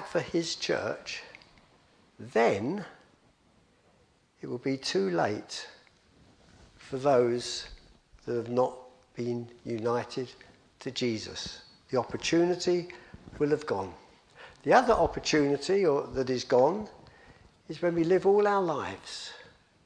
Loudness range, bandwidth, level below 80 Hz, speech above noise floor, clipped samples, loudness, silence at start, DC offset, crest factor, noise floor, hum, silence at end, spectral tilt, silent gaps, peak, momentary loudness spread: 8 LU; 10.5 kHz; -58 dBFS; 37 dB; under 0.1%; -29 LUFS; 0 s; under 0.1%; 24 dB; -65 dBFS; none; 0.4 s; -5 dB/octave; none; -8 dBFS; 19 LU